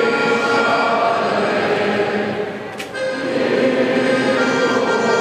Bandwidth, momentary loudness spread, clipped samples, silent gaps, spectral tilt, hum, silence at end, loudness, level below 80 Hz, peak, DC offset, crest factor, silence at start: 14.5 kHz; 7 LU; under 0.1%; none; -4.5 dB/octave; none; 0 s; -17 LUFS; -62 dBFS; -4 dBFS; under 0.1%; 12 dB; 0 s